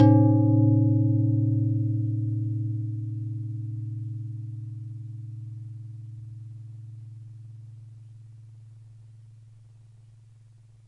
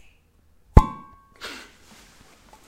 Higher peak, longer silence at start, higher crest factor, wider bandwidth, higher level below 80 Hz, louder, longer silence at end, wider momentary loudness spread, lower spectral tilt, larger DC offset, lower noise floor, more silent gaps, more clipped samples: second, -6 dBFS vs 0 dBFS; second, 0 s vs 0.75 s; about the same, 20 dB vs 24 dB; second, 2 kHz vs 13 kHz; second, -66 dBFS vs -26 dBFS; second, -25 LUFS vs -20 LUFS; second, 1.5 s vs 1.8 s; first, 25 LU vs 22 LU; first, -12 dB/octave vs -7.5 dB/octave; neither; second, -53 dBFS vs -58 dBFS; neither; second, under 0.1% vs 0.1%